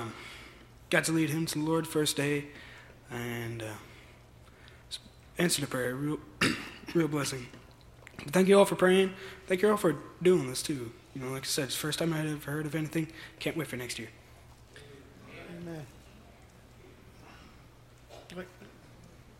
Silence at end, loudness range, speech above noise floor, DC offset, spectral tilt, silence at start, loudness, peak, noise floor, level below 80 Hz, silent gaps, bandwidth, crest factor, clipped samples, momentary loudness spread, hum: 0.2 s; 22 LU; 25 dB; under 0.1%; -4.5 dB/octave; 0 s; -30 LUFS; -8 dBFS; -55 dBFS; -60 dBFS; none; 16.5 kHz; 24 dB; under 0.1%; 22 LU; none